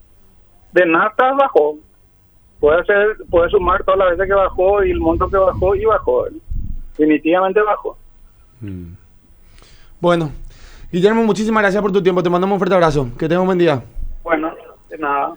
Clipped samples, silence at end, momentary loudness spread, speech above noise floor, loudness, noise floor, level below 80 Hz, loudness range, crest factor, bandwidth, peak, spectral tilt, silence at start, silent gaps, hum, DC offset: under 0.1%; 0 s; 16 LU; 36 dB; -16 LUFS; -50 dBFS; -32 dBFS; 5 LU; 16 dB; over 20 kHz; 0 dBFS; -7 dB/octave; 0.75 s; none; none; under 0.1%